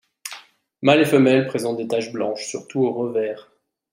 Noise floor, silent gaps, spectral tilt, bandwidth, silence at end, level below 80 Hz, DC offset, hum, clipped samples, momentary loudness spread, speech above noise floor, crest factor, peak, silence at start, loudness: -45 dBFS; none; -5.5 dB/octave; 16 kHz; 0.5 s; -68 dBFS; under 0.1%; none; under 0.1%; 20 LU; 26 dB; 20 dB; -2 dBFS; 0.25 s; -20 LUFS